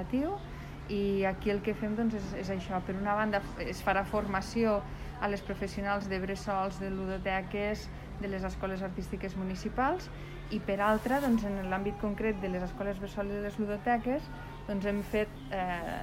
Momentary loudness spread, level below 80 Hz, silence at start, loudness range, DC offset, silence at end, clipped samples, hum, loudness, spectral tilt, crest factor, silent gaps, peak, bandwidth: 8 LU; -46 dBFS; 0 s; 3 LU; under 0.1%; 0 s; under 0.1%; none; -33 LUFS; -6.5 dB/octave; 18 dB; none; -16 dBFS; 16 kHz